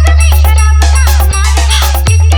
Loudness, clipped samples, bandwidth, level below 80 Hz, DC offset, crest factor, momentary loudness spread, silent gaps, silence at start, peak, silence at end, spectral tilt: -8 LUFS; under 0.1%; over 20 kHz; -6 dBFS; under 0.1%; 6 dB; 2 LU; none; 0 s; 0 dBFS; 0 s; -3.5 dB/octave